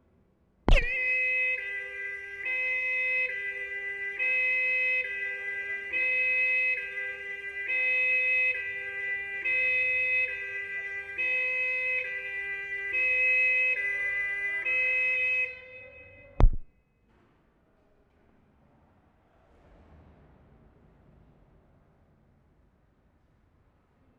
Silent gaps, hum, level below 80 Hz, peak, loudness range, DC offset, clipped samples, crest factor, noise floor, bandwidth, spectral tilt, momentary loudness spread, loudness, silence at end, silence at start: none; none; -38 dBFS; -6 dBFS; 4 LU; under 0.1%; under 0.1%; 24 dB; -66 dBFS; 8.2 kHz; -5 dB/octave; 11 LU; -27 LUFS; 7.5 s; 0.65 s